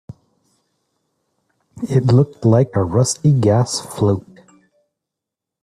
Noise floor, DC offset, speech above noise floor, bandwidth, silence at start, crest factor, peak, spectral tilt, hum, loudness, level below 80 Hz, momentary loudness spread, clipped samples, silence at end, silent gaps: -84 dBFS; under 0.1%; 69 dB; 13 kHz; 0.1 s; 18 dB; -2 dBFS; -6.5 dB/octave; none; -16 LUFS; -52 dBFS; 6 LU; under 0.1%; 1.45 s; none